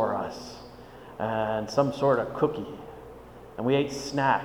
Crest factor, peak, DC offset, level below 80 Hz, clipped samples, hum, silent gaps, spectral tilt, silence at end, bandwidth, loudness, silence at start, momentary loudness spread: 20 dB; -8 dBFS; under 0.1%; -56 dBFS; under 0.1%; none; none; -6 dB/octave; 0 s; 19.5 kHz; -27 LUFS; 0 s; 20 LU